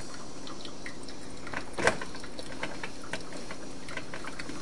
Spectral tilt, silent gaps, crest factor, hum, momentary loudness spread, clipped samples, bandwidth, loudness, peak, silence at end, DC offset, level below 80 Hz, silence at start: -3.5 dB/octave; none; 32 dB; none; 14 LU; under 0.1%; 11.5 kHz; -37 LUFS; -6 dBFS; 0 s; 2%; -54 dBFS; 0 s